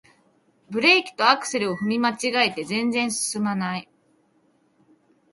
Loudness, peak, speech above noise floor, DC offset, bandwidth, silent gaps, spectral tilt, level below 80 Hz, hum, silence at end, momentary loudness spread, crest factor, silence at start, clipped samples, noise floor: -22 LUFS; -2 dBFS; 41 dB; under 0.1%; 11.5 kHz; none; -3 dB/octave; -70 dBFS; none; 1.5 s; 10 LU; 22 dB; 0.7 s; under 0.1%; -64 dBFS